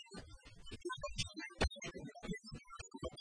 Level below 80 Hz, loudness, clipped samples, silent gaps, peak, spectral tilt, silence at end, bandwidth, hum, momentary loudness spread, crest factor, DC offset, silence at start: -52 dBFS; -45 LUFS; under 0.1%; none; -22 dBFS; -4 dB/octave; 0 s; 10.5 kHz; none; 14 LU; 24 dB; under 0.1%; 0 s